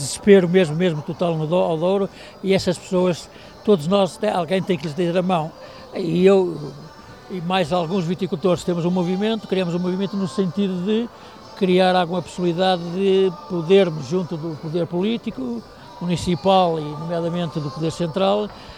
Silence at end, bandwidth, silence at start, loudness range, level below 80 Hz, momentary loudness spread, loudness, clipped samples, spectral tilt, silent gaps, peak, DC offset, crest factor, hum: 0 s; 13 kHz; 0 s; 3 LU; -52 dBFS; 13 LU; -20 LUFS; under 0.1%; -6.5 dB/octave; none; -2 dBFS; 0.1%; 20 dB; none